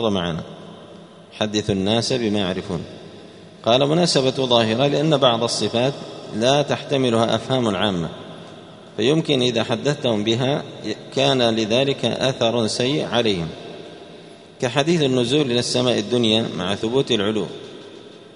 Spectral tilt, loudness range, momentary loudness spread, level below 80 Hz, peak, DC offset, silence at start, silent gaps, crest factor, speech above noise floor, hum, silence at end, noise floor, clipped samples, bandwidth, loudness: -5 dB/octave; 3 LU; 19 LU; -54 dBFS; 0 dBFS; under 0.1%; 0 s; none; 20 dB; 22 dB; none; 0.05 s; -42 dBFS; under 0.1%; 11 kHz; -20 LUFS